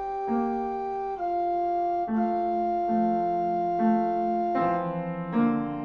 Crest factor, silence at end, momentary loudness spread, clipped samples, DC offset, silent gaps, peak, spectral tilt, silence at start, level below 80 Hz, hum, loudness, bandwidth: 14 dB; 0 s; 6 LU; under 0.1%; under 0.1%; none; -12 dBFS; -9.5 dB/octave; 0 s; -58 dBFS; none; -27 LUFS; 6 kHz